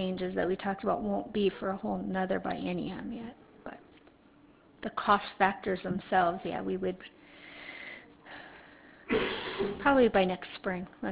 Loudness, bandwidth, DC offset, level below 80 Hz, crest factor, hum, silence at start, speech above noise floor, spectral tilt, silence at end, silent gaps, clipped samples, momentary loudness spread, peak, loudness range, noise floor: -31 LUFS; 4 kHz; under 0.1%; -58 dBFS; 22 dB; none; 0 s; 29 dB; -4 dB/octave; 0 s; none; under 0.1%; 21 LU; -10 dBFS; 6 LU; -60 dBFS